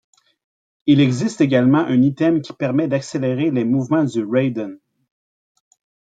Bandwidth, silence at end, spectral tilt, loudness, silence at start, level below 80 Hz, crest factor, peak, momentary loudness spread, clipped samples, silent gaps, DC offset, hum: 9.2 kHz; 1.35 s; -7 dB/octave; -18 LUFS; 0.85 s; -62 dBFS; 16 dB; -2 dBFS; 7 LU; under 0.1%; none; under 0.1%; none